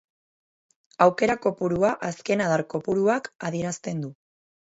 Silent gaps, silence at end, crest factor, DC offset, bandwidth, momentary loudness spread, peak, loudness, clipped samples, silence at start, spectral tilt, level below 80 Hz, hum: 3.35-3.39 s; 0.55 s; 22 dB; under 0.1%; 8 kHz; 10 LU; -4 dBFS; -25 LUFS; under 0.1%; 1 s; -6 dB/octave; -60 dBFS; none